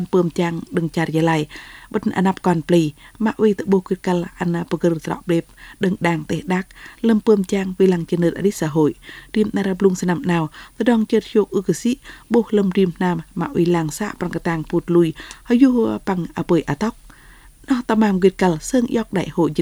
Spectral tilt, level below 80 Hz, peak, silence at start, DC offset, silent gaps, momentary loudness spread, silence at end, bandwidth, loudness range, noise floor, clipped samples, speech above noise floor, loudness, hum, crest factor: -6.5 dB/octave; -48 dBFS; -2 dBFS; 0 s; under 0.1%; none; 7 LU; 0 s; over 20 kHz; 1 LU; -45 dBFS; under 0.1%; 27 dB; -19 LUFS; none; 18 dB